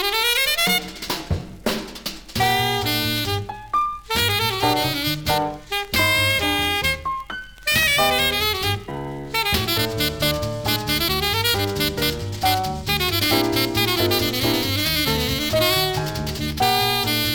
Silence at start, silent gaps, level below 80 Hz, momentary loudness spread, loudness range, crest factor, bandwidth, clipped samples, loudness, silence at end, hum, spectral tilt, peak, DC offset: 0 s; none; -40 dBFS; 9 LU; 2 LU; 16 dB; 19.5 kHz; under 0.1%; -20 LUFS; 0 s; none; -3 dB/octave; -4 dBFS; under 0.1%